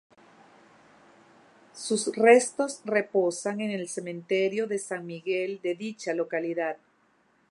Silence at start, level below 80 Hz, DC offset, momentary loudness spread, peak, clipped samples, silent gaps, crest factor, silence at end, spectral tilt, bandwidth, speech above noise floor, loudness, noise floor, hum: 1.75 s; -84 dBFS; under 0.1%; 14 LU; -6 dBFS; under 0.1%; none; 22 dB; 0.75 s; -4 dB/octave; 11.5 kHz; 39 dB; -27 LUFS; -66 dBFS; none